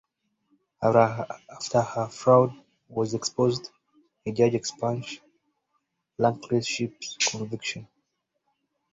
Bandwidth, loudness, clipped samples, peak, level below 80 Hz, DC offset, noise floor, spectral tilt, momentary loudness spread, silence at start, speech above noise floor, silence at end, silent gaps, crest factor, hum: 8 kHz; -26 LUFS; under 0.1%; -4 dBFS; -64 dBFS; under 0.1%; -77 dBFS; -4.5 dB/octave; 16 LU; 0.8 s; 52 dB; 1.1 s; none; 22 dB; none